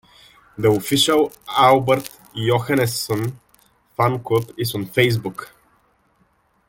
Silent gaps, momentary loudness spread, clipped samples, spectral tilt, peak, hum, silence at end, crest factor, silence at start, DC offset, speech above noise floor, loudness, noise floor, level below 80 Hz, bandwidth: none; 11 LU; under 0.1%; -5 dB/octave; -2 dBFS; none; 1.2 s; 20 dB; 0.6 s; under 0.1%; 43 dB; -19 LUFS; -62 dBFS; -54 dBFS; 17 kHz